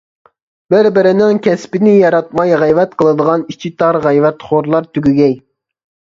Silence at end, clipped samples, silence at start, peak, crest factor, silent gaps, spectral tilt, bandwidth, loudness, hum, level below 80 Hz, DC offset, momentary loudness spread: 0.75 s; under 0.1%; 0.7 s; 0 dBFS; 12 dB; none; -7.5 dB/octave; 7.6 kHz; -12 LUFS; none; -52 dBFS; under 0.1%; 6 LU